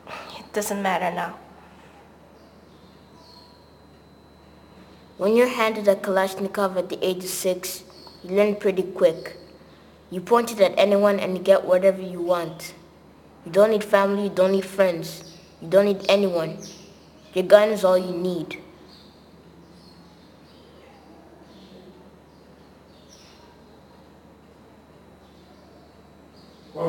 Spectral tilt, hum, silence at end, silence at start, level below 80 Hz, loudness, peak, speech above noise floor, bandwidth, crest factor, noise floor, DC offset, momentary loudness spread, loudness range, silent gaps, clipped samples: -5 dB/octave; none; 0 s; 0.05 s; -62 dBFS; -22 LUFS; 0 dBFS; 30 dB; 19.5 kHz; 24 dB; -51 dBFS; under 0.1%; 20 LU; 9 LU; none; under 0.1%